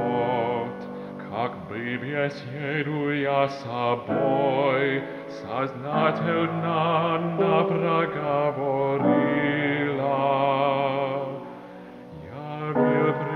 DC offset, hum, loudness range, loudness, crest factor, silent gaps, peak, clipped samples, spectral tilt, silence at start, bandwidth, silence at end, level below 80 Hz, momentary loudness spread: under 0.1%; none; 4 LU; -25 LUFS; 18 dB; none; -8 dBFS; under 0.1%; -8 dB/octave; 0 s; 6.6 kHz; 0 s; -64 dBFS; 14 LU